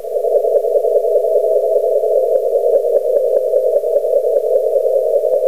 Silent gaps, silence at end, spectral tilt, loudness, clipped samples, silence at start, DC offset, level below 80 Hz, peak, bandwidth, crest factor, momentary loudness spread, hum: none; 0 s; -5 dB/octave; -15 LUFS; under 0.1%; 0 s; 1%; -72 dBFS; -2 dBFS; 15.5 kHz; 12 dB; 1 LU; none